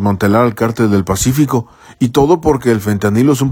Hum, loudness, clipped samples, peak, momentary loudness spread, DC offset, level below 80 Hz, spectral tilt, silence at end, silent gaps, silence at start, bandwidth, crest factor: none; -13 LUFS; under 0.1%; 0 dBFS; 4 LU; under 0.1%; -36 dBFS; -6 dB/octave; 0 s; none; 0 s; 18.5 kHz; 12 dB